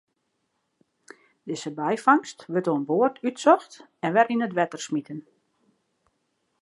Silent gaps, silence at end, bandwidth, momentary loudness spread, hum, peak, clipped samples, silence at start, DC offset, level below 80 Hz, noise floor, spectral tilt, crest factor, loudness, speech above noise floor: none; 1.4 s; 11.5 kHz; 13 LU; none; -4 dBFS; under 0.1%; 1.45 s; under 0.1%; -82 dBFS; -75 dBFS; -5.5 dB/octave; 22 dB; -24 LUFS; 52 dB